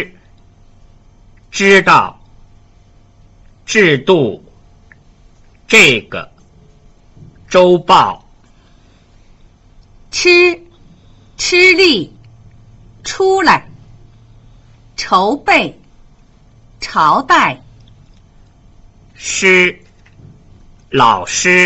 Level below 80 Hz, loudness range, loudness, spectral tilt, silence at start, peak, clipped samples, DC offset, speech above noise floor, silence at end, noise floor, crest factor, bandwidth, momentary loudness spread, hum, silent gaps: -44 dBFS; 5 LU; -10 LUFS; -3.5 dB/octave; 0 s; 0 dBFS; under 0.1%; under 0.1%; 36 dB; 0 s; -46 dBFS; 14 dB; 13.5 kHz; 20 LU; none; none